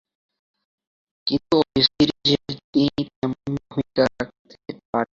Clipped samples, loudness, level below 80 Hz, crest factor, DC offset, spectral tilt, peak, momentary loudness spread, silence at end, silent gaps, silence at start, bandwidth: under 0.1%; -22 LUFS; -52 dBFS; 22 dB; under 0.1%; -6 dB/octave; -2 dBFS; 15 LU; 0.1 s; 2.64-2.73 s, 3.16-3.22 s, 4.39-4.45 s, 4.85-4.93 s; 1.25 s; 7.6 kHz